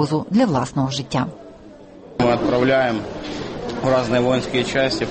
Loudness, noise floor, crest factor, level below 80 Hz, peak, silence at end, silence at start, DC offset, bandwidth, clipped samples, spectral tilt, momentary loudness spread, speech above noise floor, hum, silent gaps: -20 LUFS; -41 dBFS; 14 dB; -46 dBFS; -6 dBFS; 0 s; 0 s; under 0.1%; 8.8 kHz; under 0.1%; -6 dB/octave; 11 LU; 22 dB; none; none